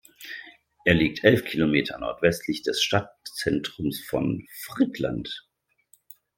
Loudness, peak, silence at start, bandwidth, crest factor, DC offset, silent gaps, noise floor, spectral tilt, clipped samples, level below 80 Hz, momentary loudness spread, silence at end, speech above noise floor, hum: -25 LUFS; -2 dBFS; 0.2 s; 17 kHz; 24 dB; under 0.1%; none; -63 dBFS; -5 dB/octave; under 0.1%; -52 dBFS; 16 LU; 0.95 s; 38 dB; none